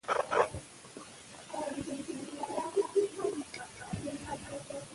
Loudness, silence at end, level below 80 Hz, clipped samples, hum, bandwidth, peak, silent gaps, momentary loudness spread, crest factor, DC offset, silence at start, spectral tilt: -36 LUFS; 0 s; -62 dBFS; under 0.1%; none; 11.5 kHz; -12 dBFS; none; 17 LU; 24 dB; under 0.1%; 0.05 s; -4.5 dB/octave